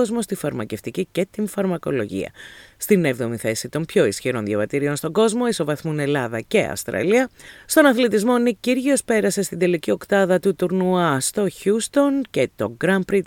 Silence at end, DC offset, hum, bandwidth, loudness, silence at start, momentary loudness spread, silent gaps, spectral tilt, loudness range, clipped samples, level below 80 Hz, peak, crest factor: 0 s; under 0.1%; none; 18.5 kHz; -21 LUFS; 0 s; 8 LU; none; -5 dB/octave; 4 LU; under 0.1%; -56 dBFS; 0 dBFS; 20 dB